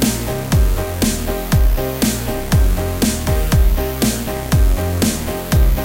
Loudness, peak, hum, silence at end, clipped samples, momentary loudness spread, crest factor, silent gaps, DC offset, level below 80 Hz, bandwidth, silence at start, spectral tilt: -18 LUFS; -4 dBFS; none; 0 s; under 0.1%; 3 LU; 12 dB; none; under 0.1%; -18 dBFS; 17 kHz; 0 s; -5 dB/octave